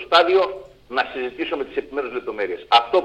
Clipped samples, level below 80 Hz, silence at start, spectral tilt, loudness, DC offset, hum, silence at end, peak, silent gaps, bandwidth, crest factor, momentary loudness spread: under 0.1%; -56 dBFS; 0 s; -3.5 dB/octave; -21 LUFS; under 0.1%; none; 0 s; 0 dBFS; none; 9 kHz; 20 dB; 12 LU